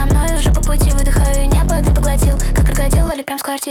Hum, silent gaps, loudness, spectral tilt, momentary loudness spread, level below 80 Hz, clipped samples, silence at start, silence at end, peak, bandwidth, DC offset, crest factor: none; none; -16 LUFS; -5.5 dB/octave; 4 LU; -14 dBFS; under 0.1%; 0 s; 0 s; -4 dBFS; 17.5 kHz; under 0.1%; 8 dB